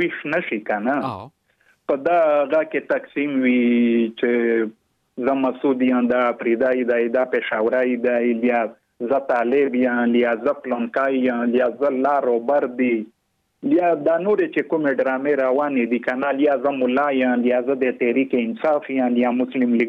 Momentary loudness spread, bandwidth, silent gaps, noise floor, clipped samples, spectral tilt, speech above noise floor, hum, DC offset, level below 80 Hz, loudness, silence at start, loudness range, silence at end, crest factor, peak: 5 LU; 4.7 kHz; none; -61 dBFS; under 0.1%; -8 dB/octave; 42 dB; none; under 0.1%; -70 dBFS; -20 LUFS; 0 s; 1 LU; 0 s; 12 dB; -8 dBFS